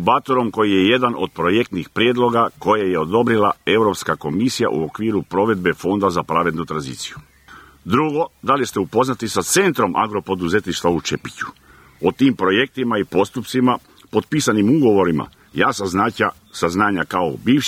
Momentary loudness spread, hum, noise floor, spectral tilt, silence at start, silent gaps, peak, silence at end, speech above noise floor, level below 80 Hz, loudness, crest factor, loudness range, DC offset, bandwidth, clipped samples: 8 LU; none; -44 dBFS; -5 dB/octave; 0 s; none; 0 dBFS; 0 s; 26 dB; -52 dBFS; -18 LUFS; 18 dB; 3 LU; under 0.1%; 16 kHz; under 0.1%